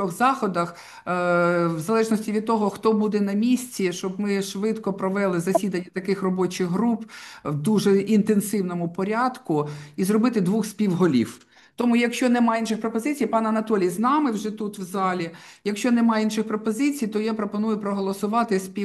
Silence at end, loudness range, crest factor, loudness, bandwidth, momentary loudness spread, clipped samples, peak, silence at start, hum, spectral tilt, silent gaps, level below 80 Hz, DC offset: 0 s; 2 LU; 16 dB; -23 LUFS; 12.5 kHz; 8 LU; under 0.1%; -6 dBFS; 0 s; none; -6 dB/octave; none; -68 dBFS; under 0.1%